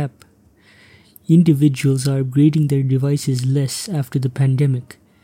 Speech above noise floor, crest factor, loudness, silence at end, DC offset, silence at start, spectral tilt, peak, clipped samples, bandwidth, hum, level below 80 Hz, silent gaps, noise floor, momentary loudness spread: 36 dB; 14 dB; -17 LUFS; 0.4 s; under 0.1%; 0 s; -7 dB/octave; -4 dBFS; under 0.1%; 16 kHz; none; -58 dBFS; none; -52 dBFS; 8 LU